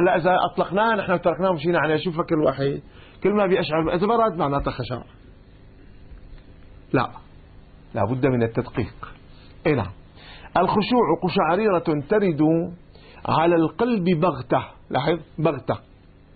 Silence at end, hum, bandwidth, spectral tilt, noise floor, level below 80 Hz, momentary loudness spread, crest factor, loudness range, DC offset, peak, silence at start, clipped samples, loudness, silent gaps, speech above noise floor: 0.55 s; none; 4.8 kHz; -11.5 dB/octave; -47 dBFS; -46 dBFS; 11 LU; 16 dB; 6 LU; under 0.1%; -6 dBFS; 0 s; under 0.1%; -22 LUFS; none; 26 dB